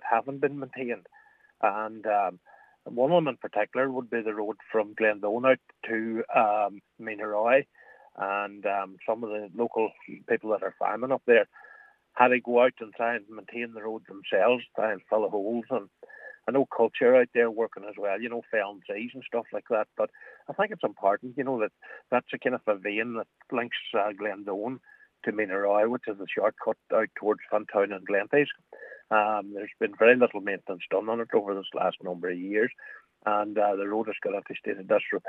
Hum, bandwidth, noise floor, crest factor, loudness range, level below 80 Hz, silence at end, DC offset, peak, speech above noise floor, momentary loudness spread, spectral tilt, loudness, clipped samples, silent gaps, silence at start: none; 4 kHz; -55 dBFS; 24 dB; 4 LU; -86 dBFS; 0 s; under 0.1%; -4 dBFS; 27 dB; 12 LU; -7.5 dB/octave; -28 LUFS; under 0.1%; none; 0 s